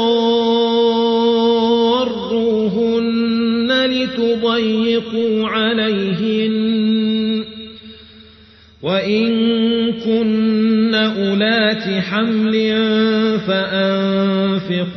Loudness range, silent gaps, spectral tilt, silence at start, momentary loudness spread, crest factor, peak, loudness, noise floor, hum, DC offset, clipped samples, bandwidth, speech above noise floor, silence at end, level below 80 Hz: 4 LU; none; -7 dB/octave; 0 s; 4 LU; 12 dB; -4 dBFS; -16 LUFS; -45 dBFS; none; under 0.1%; under 0.1%; 6.2 kHz; 29 dB; 0 s; -54 dBFS